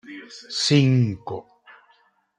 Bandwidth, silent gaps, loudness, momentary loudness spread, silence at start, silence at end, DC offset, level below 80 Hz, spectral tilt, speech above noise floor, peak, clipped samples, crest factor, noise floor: 10 kHz; none; -21 LUFS; 21 LU; 0.1 s; 1 s; under 0.1%; -64 dBFS; -5.5 dB/octave; 41 dB; -6 dBFS; under 0.1%; 18 dB; -61 dBFS